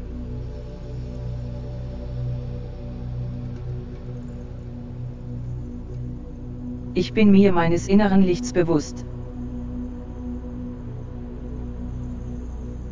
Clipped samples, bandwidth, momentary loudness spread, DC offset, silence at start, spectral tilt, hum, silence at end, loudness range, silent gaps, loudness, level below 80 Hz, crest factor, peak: under 0.1%; 7.6 kHz; 17 LU; under 0.1%; 0 s; -7.5 dB/octave; 60 Hz at -40 dBFS; 0 s; 13 LU; none; -26 LUFS; -36 dBFS; 20 dB; -4 dBFS